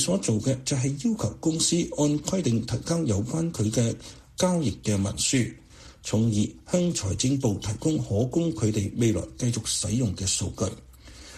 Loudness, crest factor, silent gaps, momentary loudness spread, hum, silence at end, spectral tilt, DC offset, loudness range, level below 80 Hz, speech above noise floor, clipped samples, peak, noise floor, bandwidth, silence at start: -26 LUFS; 16 dB; none; 5 LU; none; 0 s; -5 dB/octave; under 0.1%; 1 LU; -48 dBFS; 21 dB; under 0.1%; -10 dBFS; -46 dBFS; 13.5 kHz; 0 s